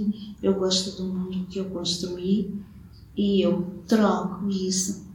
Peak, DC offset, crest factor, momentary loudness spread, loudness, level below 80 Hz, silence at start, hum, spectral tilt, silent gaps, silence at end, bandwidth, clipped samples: -8 dBFS; under 0.1%; 16 dB; 9 LU; -25 LUFS; -52 dBFS; 0 s; none; -5 dB/octave; none; 0 s; 17.5 kHz; under 0.1%